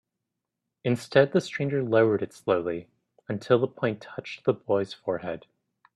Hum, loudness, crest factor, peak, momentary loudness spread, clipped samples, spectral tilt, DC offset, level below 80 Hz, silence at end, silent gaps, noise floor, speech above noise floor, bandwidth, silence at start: none; -27 LUFS; 22 dB; -4 dBFS; 14 LU; under 0.1%; -7 dB/octave; under 0.1%; -68 dBFS; 0.55 s; none; -84 dBFS; 59 dB; 12.5 kHz; 0.85 s